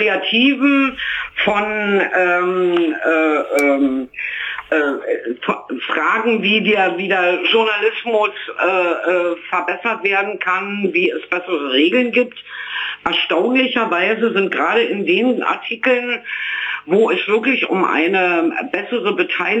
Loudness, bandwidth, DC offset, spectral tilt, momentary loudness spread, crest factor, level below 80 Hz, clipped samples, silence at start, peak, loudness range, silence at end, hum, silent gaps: -17 LUFS; 15.5 kHz; under 0.1%; -5 dB/octave; 7 LU; 14 dB; -60 dBFS; under 0.1%; 0 s; -4 dBFS; 2 LU; 0 s; 50 Hz at -50 dBFS; none